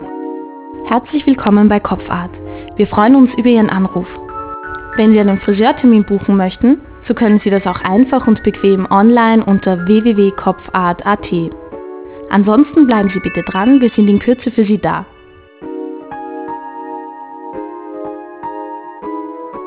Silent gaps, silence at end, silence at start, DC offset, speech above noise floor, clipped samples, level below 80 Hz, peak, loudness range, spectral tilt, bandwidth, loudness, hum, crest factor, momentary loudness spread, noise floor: none; 0 s; 0 s; under 0.1%; 30 dB; under 0.1%; -40 dBFS; 0 dBFS; 15 LU; -11.5 dB/octave; 4 kHz; -12 LUFS; none; 12 dB; 18 LU; -41 dBFS